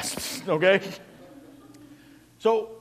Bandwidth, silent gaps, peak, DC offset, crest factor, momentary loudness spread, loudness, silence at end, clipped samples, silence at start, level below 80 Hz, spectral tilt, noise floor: 15.5 kHz; none; -6 dBFS; under 0.1%; 20 dB; 16 LU; -24 LUFS; 0 s; under 0.1%; 0 s; -64 dBFS; -3.5 dB/octave; -52 dBFS